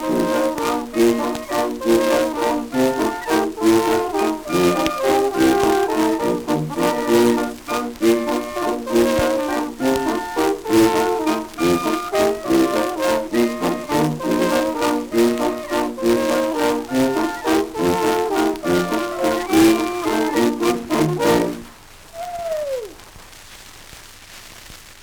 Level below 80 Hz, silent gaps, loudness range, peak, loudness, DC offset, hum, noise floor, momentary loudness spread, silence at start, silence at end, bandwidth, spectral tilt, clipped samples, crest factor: -46 dBFS; none; 3 LU; 0 dBFS; -19 LUFS; under 0.1%; none; -42 dBFS; 9 LU; 0 s; 0 s; over 20 kHz; -4.5 dB/octave; under 0.1%; 18 dB